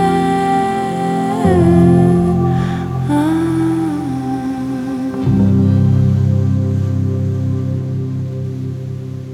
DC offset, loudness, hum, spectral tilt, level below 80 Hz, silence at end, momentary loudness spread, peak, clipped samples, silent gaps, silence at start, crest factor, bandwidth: under 0.1%; -15 LUFS; none; -8.5 dB/octave; -38 dBFS; 0 s; 10 LU; 0 dBFS; under 0.1%; none; 0 s; 14 dB; 12 kHz